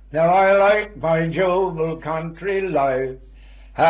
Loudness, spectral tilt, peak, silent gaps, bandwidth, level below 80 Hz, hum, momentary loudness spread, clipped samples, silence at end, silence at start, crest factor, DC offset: -19 LUFS; -10 dB/octave; -6 dBFS; none; 4 kHz; -44 dBFS; none; 12 LU; under 0.1%; 0 s; 0.1 s; 14 dB; under 0.1%